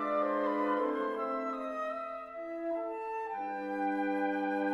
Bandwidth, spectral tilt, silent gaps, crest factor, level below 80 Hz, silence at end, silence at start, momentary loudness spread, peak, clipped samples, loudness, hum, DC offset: 10.5 kHz; -6.5 dB/octave; none; 14 dB; -74 dBFS; 0 s; 0 s; 8 LU; -20 dBFS; under 0.1%; -34 LUFS; none; under 0.1%